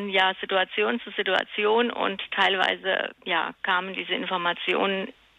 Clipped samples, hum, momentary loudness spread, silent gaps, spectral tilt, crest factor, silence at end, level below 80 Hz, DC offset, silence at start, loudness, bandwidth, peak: under 0.1%; none; 5 LU; none; -4.5 dB/octave; 18 dB; 0.25 s; -70 dBFS; under 0.1%; 0 s; -25 LUFS; 9.6 kHz; -8 dBFS